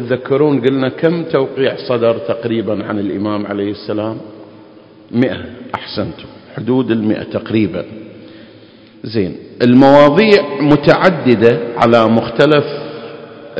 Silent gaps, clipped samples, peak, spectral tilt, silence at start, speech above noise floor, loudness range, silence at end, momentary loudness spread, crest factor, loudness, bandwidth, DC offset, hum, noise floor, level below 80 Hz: none; 0.6%; 0 dBFS; -8 dB/octave; 0 s; 28 dB; 10 LU; 0 s; 16 LU; 14 dB; -13 LUFS; 8 kHz; under 0.1%; none; -41 dBFS; -48 dBFS